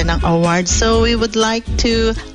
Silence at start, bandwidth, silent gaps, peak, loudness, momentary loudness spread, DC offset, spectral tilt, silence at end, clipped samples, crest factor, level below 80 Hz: 0 s; 11 kHz; none; -2 dBFS; -15 LUFS; 3 LU; under 0.1%; -4 dB/octave; 0 s; under 0.1%; 12 dB; -22 dBFS